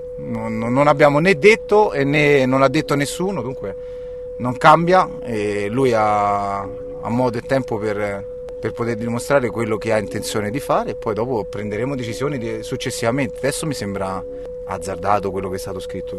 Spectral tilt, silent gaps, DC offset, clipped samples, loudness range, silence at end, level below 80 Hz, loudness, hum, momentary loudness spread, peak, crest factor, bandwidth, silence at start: -5.5 dB/octave; none; under 0.1%; under 0.1%; 7 LU; 0 s; -44 dBFS; -19 LUFS; none; 14 LU; 0 dBFS; 18 dB; 13 kHz; 0 s